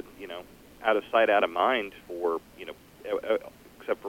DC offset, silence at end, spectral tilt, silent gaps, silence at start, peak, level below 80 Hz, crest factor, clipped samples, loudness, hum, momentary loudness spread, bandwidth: under 0.1%; 0 s; -4.5 dB/octave; none; 0 s; -8 dBFS; -62 dBFS; 20 dB; under 0.1%; -27 LUFS; none; 20 LU; 17 kHz